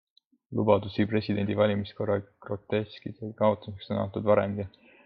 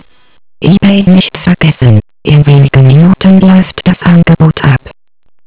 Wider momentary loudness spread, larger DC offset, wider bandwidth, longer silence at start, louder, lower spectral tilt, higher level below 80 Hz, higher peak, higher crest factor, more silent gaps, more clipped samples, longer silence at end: first, 13 LU vs 6 LU; second, under 0.1% vs 3%; first, 5.4 kHz vs 4 kHz; first, 0.5 s vs 0.1 s; second, -28 LUFS vs -6 LUFS; second, -10 dB/octave vs -11.5 dB/octave; second, -64 dBFS vs -30 dBFS; second, -8 dBFS vs 0 dBFS; first, 22 dB vs 6 dB; neither; second, under 0.1% vs 8%; first, 0.35 s vs 0 s